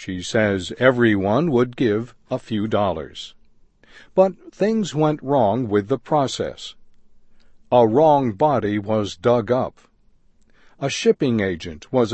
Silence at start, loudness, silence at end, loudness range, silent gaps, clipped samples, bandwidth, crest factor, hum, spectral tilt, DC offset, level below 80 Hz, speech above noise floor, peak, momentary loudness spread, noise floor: 0 s; -20 LUFS; 0 s; 3 LU; none; under 0.1%; 8.6 kHz; 20 dB; none; -6 dB/octave; under 0.1%; -52 dBFS; 36 dB; -2 dBFS; 13 LU; -55 dBFS